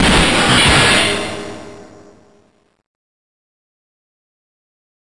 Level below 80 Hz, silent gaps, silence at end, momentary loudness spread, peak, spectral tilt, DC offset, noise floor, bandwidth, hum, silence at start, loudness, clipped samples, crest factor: -32 dBFS; none; 3.25 s; 20 LU; -4 dBFS; -3 dB/octave; under 0.1%; -56 dBFS; 11.5 kHz; none; 0 s; -11 LUFS; under 0.1%; 14 dB